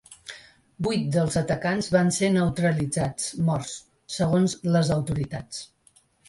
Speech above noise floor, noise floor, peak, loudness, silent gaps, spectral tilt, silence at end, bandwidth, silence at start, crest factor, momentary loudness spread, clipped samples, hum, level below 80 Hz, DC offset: 37 dB; -61 dBFS; -6 dBFS; -25 LUFS; none; -5.5 dB/octave; 0.65 s; 11.5 kHz; 0.1 s; 18 dB; 15 LU; under 0.1%; none; -50 dBFS; under 0.1%